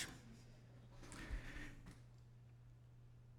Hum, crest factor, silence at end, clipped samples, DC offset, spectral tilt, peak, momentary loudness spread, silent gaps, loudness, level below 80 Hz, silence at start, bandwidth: none; 24 dB; 0 s; under 0.1%; under 0.1%; -4 dB/octave; -32 dBFS; 12 LU; none; -57 LUFS; -58 dBFS; 0 s; 17 kHz